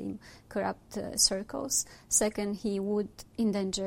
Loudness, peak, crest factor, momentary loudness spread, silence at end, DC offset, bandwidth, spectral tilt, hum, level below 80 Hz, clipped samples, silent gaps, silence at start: -30 LUFS; -10 dBFS; 22 dB; 13 LU; 0 s; under 0.1%; 16 kHz; -3 dB/octave; none; -56 dBFS; under 0.1%; none; 0 s